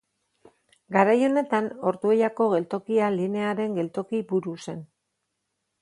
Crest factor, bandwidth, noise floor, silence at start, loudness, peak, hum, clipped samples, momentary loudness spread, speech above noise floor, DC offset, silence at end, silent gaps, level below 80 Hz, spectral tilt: 22 dB; 11 kHz; -79 dBFS; 0.9 s; -25 LUFS; -4 dBFS; none; under 0.1%; 9 LU; 55 dB; under 0.1%; 0.95 s; none; -74 dBFS; -7 dB/octave